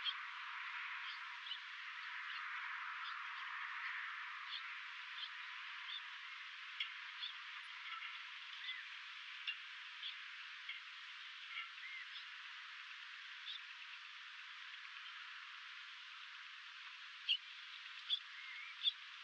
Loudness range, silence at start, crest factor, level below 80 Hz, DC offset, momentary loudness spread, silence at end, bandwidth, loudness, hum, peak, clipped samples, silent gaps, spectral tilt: 5 LU; 0 s; 24 dB; under -90 dBFS; under 0.1%; 9 LU; 0 s; 8.8 kHz; -47 LUFS; none; -26 dBFS; under 0.1%; none; 6.5 dB/octave